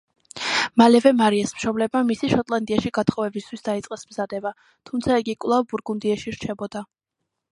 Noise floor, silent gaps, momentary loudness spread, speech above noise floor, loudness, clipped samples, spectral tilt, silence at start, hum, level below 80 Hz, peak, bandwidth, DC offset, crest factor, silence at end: -81 dBFS; none; 15 LU; 59 dB; -22 LUFS; under 0.1%; -5 dB/octave; 0.35 s; none; -54 dBFS; -2 dBFS; 11.5 kHz; under 0.1%; 20 dB; 0.65 s